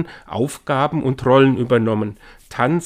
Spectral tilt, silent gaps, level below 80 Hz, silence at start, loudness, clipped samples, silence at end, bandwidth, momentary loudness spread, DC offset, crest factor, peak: -7 dB/octave; none; -50 dBFS; 0 s; -18 LUFS; under 0.1%; 0 s; 15.5 kHz; 12 LU; under 0.1%; 18 dB; 0 dBFS